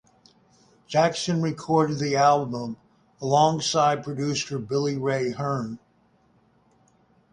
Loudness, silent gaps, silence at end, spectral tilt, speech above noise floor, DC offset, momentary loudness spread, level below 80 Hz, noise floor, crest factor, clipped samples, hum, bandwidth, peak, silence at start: -24 LUFS; none; 1.55 s; -5 dB/octave; 39 dB; under 0.1%; 13 LU; -62 dBFS; -63 dBFS; 20 dB; under 0.1%; none; 11 kHz; -6 dBFS; 0.9 s